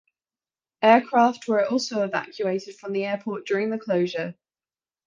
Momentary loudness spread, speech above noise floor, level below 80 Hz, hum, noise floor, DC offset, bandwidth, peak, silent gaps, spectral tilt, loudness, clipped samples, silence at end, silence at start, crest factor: 12 LU; over 67 dB; -74 dBFS; none; under -90 dBFS; under 0.1%; 9.4 kHz; -2 dBFS; none; -5 dB/octave; -24 LUFS; under 0.1%; 0.75 s; 0.8 s; 22 dB